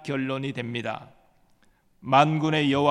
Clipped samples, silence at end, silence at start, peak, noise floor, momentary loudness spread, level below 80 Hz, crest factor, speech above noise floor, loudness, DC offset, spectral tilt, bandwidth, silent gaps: under 0.1%; 0 s; 0 s; -4 dBFS; -62 dBFS; 15 LU; -64 dBFS; 22 dB; 38 dB; -24 LUFS; under 0.1%; -6.5 dB/octave; 10.5 kHz; none